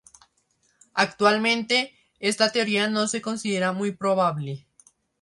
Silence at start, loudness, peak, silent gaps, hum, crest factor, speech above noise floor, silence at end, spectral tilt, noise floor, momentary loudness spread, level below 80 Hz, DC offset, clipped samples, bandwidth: 0.95 s; -23 LUFS; -4 dBFS; none; none; 20 dB; 45 dB; 0.65 s; -3.5 dB/octave; -68 dBFS; 10 LU; -70 dBFS; under 0.1%; under 0.1%; 11.5 kHz